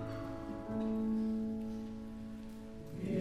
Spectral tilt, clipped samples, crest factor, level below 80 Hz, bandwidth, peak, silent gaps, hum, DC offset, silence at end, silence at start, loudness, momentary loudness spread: -8.5 dB/octave; under 0.1%; 14 dB; -56 dBFS; 11 kHz; -26 dBFS; none; none; 0.1%; 0 s; 0 s; -40 LUFS; 12 LU